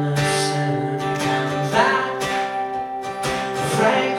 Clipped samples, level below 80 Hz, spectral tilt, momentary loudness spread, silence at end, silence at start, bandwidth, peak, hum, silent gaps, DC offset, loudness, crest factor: under 0.1%; -52 dBFS; -4.5 dB/octave; 8 LU; 0 s; 0 s; 16.5 kHz; -2 dBFS; none; none; under 0.1%; -21 LUFS; 18 dB